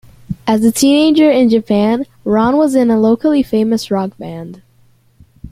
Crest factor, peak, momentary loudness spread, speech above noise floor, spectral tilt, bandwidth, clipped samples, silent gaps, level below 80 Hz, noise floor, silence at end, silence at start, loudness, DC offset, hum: 12 dB; 0 dBFS; 16 LU; 39 dB; -5.5 dB/octave; 16 kHz; under 0.1%; none; -46 dBFS; -51 dBFS; 0.05 s; 0.3 s; -13 LUFS; under 0.1%; none